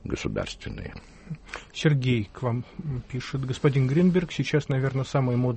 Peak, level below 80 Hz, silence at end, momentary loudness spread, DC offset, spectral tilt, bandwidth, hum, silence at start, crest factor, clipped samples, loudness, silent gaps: -8 dBFS; -48 dBFS; 0 s; 16 LU; under 0.1%; -7 dB/octave; 8.4 kHz; none; 0.05 s; 18 dB; under 0.1%; -26 LUFS; none